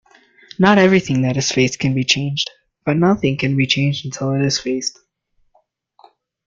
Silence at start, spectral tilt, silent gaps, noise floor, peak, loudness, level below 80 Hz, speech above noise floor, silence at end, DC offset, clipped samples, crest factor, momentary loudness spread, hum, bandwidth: 0.6 s; -5 dB/octave; none; -63 dBFS; 0 dBFS; -17 LUFS; -52 dBFS; 46 dB; 1.55 s; under 0.1%; under 0.1%; 18 dB; 10 LU; none; 7.6 kHz